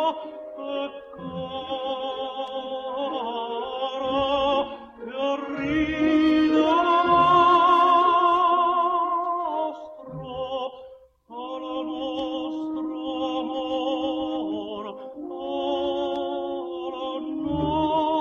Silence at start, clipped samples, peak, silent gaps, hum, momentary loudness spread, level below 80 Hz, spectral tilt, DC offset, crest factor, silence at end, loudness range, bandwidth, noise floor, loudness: 0 s; under 0.1%; -8 dBFS; none; none; 17 LU; -54 dBFS; -6 dB/octave; under 0.1%; 16 dB; 0 s; 12 LU; 7 kHz; -48 dBFS; -24 LUFS